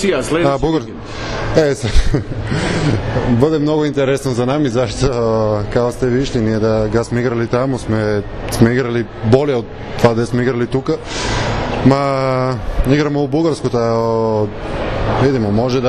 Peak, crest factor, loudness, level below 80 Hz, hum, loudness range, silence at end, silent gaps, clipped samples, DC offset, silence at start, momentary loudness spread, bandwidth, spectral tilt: 0 dBFS; 14 dB; -16 LUFS; -26 dBFS; none; 1 LU; 0 s; none; under 0.1%; under 0.1%; 0 s; 6 LU; 14 kHz; -6.5 dB/octave